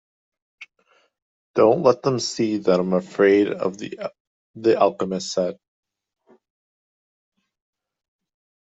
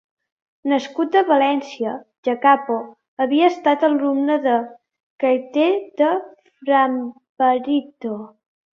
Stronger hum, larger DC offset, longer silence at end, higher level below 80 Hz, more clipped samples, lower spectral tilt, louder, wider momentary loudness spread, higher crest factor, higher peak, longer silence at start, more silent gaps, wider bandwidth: neither; neither; first, 3.2 s vs 0.45 s; about the same, -68 dBFS vs -70 dBFS; neither; about the same, -5.5 dB/octave vs -5 dB/octave; about the same, -21 LUFS vs -19 LUFS; about the same, 11 LU vs 13 LU; about the same, 20 dB vs 18 dB; about the same, -2 dBFS vs -2 dBFS; about the same, 0.6 s vs 0.65 s; first, 1.22-1.54 s, 4.20-4.54 s vs 2.18-2.23 s, 3.08-3.17 s, 5.03-5.19 s, 7.29-7.35 s; first, 8 kHz vs 7 kHz